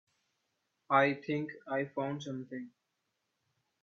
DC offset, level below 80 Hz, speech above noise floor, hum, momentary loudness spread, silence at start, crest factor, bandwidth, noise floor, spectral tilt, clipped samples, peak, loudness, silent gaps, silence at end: under 0.1%; -84 dBFS; 50 dB; none; 17 LU; 0.9 s; 24 dB; 7.6 kHz; -84 dBFS; -6.5 dB/octave; under 0.1%; -14 dBFS; -34 LUFS; none; 1.15 s